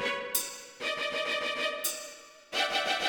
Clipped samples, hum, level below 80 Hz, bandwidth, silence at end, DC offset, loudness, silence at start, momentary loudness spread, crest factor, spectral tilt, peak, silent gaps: under 0.1%; none; -70 dBFS; 19 kHz; 0 s; under 0.1%; -31 LUFS; 0 s; 11 LU; 22 dB; 0.5 dB/octave; -12 dBFS; none